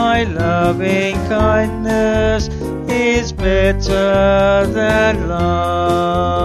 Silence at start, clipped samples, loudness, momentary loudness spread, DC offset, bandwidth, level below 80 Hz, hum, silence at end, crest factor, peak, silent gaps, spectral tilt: 0 s; under 0.1%; -15 LUFS; 4 LU; under 0.1%; 14 kHz; -26 dBFS; none; 0 s; 14 dB; -2 dBFS; none; -6 dB/octave